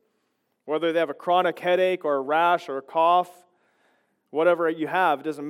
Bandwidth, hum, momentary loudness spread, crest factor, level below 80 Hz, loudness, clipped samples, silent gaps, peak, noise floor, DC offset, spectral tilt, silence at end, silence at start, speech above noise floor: 15.5 kHz; none; 6 LU; 16 dB; -90 dBFS; -23 LUFS; under 0.1%; none; -8 dBFS; -74 dBFS; under 0.1%; -5.5 dB/octave; 0 s; 0.65 s; 51 dB